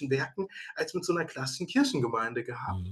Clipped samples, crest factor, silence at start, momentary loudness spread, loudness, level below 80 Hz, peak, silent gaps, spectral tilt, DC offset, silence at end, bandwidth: under 0.1%; 18 dB; 0 s; 8 LU; -31 LUFS; -62 dBFS; -14 dBFS; none; -5 dB/octave; under 0.1%; 0 s; 12.5 kHz